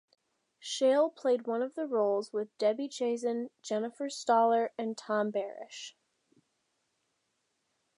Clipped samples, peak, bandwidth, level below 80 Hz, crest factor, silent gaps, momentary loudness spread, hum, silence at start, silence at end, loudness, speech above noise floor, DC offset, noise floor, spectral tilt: under 0.1%; -14 dBFS; 11.5 kHz; under -90 dBFS; 18 dB; none; 13 LU; none; 0.65 s; 2.05 s; -31 LUFS; 49 dB; under 0.1%; -80 dBFS; -4 dB/octave